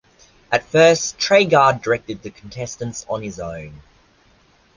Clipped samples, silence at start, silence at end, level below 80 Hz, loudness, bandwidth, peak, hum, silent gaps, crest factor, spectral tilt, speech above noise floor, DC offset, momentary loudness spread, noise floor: under 0.1%; 0.5 s; 1 s; -52 dBFS; -17 LUFS; 10 kHz; -2 dBFS; none; none; 18 dB; -3.5 dB/octave; 37 dB; under 0.1%; 19 LU; -55 dBFS